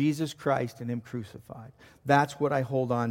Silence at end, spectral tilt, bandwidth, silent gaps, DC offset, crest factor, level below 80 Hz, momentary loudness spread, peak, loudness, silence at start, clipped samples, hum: 0 s; -6.5 dB/octave; 16.5 kHz; none; under 0.1%; 22 dB; -66 dBFS; 20 LU; -8 dBFS; -29 LUFS; 0 s; under 0.1%; none